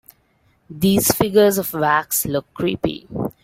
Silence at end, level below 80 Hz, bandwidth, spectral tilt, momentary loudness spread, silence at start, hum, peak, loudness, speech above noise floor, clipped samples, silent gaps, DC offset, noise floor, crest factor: 0.15 s; -48 dBFS; 16.5 kHz; -4.5 dB/octave; 10 LU; 0.7 s; none; -2 dBFS; -18 LUFS; 42 dB; under 0.1%; none; under 0.1%; -61 dBFS; 18 dB